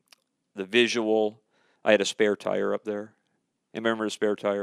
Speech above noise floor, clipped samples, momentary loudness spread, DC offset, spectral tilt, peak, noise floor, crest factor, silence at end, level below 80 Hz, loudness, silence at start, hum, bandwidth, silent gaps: 50 dB; under 0.1%; 15 LU; under 0.1%; -3.5 dB/octave; -6 dBFS; -76 dBFS; 22 dB; 0 s; -86 dBFS; -26 LUFS; 0.55 s; none; 12 kHz; none